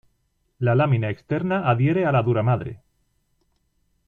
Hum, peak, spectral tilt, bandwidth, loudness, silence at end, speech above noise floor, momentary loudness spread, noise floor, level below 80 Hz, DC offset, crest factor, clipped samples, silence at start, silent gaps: none; -6 dBFS; -10 dB/octave; 4.5 kHz; -22 LUFS; 1.3 s; 49 dB; 7 LU; -69 dBFS; -54 dBFS; under 0.1%; 16 dB; under 0.1%; 0.6 s; none